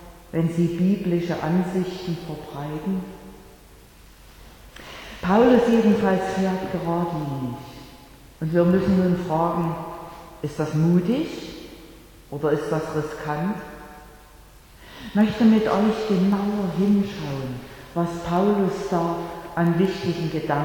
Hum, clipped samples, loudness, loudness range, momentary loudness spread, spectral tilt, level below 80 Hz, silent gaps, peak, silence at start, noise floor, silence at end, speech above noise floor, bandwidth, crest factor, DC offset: none; under 0.1%; -23 LUFS; 7 LU; 19 LU; -7.5 dB/octave; -48 dBFS; none; -4 dBFS; 0 s; -48 dBFS; 0 s; 26 dB; 18.5 kHz; 20 dB; under 0.1%